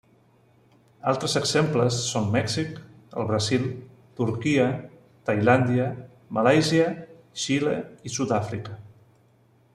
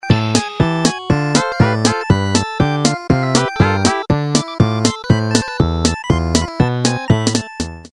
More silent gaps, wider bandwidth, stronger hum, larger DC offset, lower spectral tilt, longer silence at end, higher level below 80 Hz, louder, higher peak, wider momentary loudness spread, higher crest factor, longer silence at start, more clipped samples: neither; about the same, 13 kHz vs 12 kHz; neither; second, under 0.1% vs 0.1%; about the same, -5 dB/octave vs -5 dB/octave; first, 0.85 s vs 0.05 s; second, -60 dBFS vs -32 dBFS; second, -25 LUFS vs -16 LUFS; second, -6 dBFS vs 0 dBFS; first, 17 LU vs 4 LU; about the same, 20 dB vs 16 dB; first, 1.05 s vs 0.05 s; neither